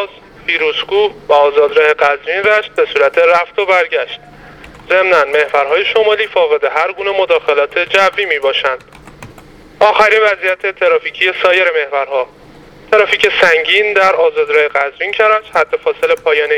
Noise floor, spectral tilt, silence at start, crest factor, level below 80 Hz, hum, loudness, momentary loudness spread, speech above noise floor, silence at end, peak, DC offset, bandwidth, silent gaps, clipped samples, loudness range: -38 dBFS; -2.5 dB/octave; 0 s; 12 dB; -50 dBFS; none; -12 LUFS; 6 LU; 26 dB; 0 s; 0 dBFS; under 0.1%; 13 kHz; none; under 0.1%; 2 LU